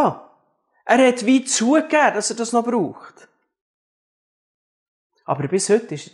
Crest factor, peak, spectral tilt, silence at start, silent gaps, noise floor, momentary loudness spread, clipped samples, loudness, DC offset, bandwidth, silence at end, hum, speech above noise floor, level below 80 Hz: 20 dB; -2 dBFS; -4 dB/octave; 0 s; 3.61-5.10 s; -64 dBFS; 12 LU; under 0.1%; -18 LUFS; under 0.1%; 11.5 kHz; 0.1 s; none; 46 dB; -76 dBFS